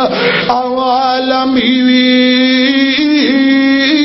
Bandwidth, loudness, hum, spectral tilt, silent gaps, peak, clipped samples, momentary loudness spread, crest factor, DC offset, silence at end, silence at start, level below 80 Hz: 6 kHz; -10 LUFS; none; -5 dB/octave; none; 0 dBFS; under 0.1%; 4 LU; 10 dB; under 0.1%; 0 s; 0 s; -48 dBFS